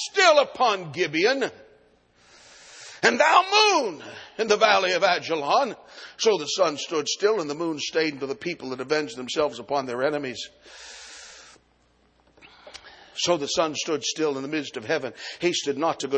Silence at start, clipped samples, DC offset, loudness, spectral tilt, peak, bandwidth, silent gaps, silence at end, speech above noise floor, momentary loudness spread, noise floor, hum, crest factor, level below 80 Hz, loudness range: 0 s; under 0.1%; under 0.1%; -23 LUFS; -2.5 dB/octave; -2 dBFS; 9.4 kHz; none; 0 s; 39 dB; 22 LU; -63 dBFS; none; 22 dB; -68 dBFS; 10 LU